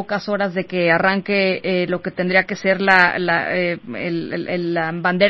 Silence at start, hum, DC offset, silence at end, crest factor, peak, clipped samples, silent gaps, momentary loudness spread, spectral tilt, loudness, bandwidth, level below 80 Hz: 0 s; none; 0.3%; 0 s; 18 dB; 0 dBFS; under 0.1%; none; 10 LU; -6.5 dB/octave; -18 LUFS; 8 kHz; -58 dBFS